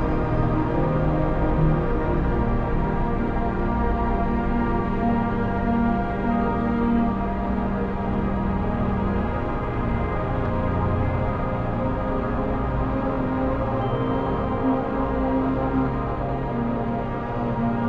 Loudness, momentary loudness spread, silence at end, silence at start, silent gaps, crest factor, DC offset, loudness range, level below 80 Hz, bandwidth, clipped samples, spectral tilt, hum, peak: -24 LUFS; 3 LU; 0 s; 0 s; none; 14 dB; under 0.1%; 2 LU; -30 dBFS; 5.4 kHz; under 0.1%; -10 dB/octave; none; -8 dBFS